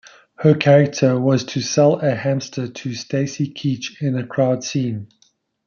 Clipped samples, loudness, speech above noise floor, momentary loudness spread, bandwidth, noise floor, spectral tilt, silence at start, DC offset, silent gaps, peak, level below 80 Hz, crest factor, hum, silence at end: under 0.1%; -19 LUFS; 43 dB; 12 LU; 7.2 kHz; -61 dBFS; -6 dB/octave; 0.4 s; under 0.1%; none; -2 dBFS; -62 dBFS; 18 dB; none; 0.6 s